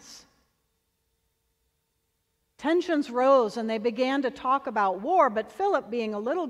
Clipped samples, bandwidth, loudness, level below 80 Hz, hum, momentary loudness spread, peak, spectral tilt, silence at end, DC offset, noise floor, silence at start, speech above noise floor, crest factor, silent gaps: under 0.1%; 11.5 kHz; -26 LUFS; -70 dBFS; none; 7 LU; -10 dBFS; -5 dB/octave; 0 s; under 0.1%; -76 dBFS; 0.05 s; 51 dB; 18 dB; none